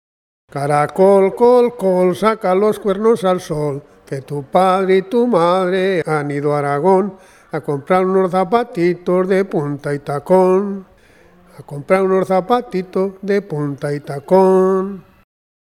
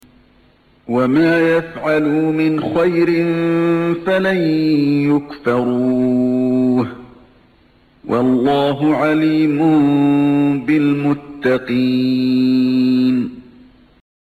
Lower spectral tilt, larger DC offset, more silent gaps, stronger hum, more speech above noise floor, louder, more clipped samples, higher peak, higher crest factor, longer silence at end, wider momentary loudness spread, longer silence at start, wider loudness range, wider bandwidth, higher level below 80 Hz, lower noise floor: about the same, -7.5 dB/octave vs -8 dB/octave; neither; neither; neither; second, 33 dB vs 37 dB; about the same, -16 LUFS vs -15 LUFS; neither; first, 0 dBFS vs -4 dBFS; first, 16 dB vs 10 dB; second, 0.75 s vs 0.95 s; first, 13 LU vs 5 LU; second, 0.55 s vs 0.9 s; about the same, 3 LU vs 3 LU; first, 13 kHz vs 8.6 kHz; about the same, -54 dBFS vs -52 dBFS; second, -48 dBFS vs -52 dBFS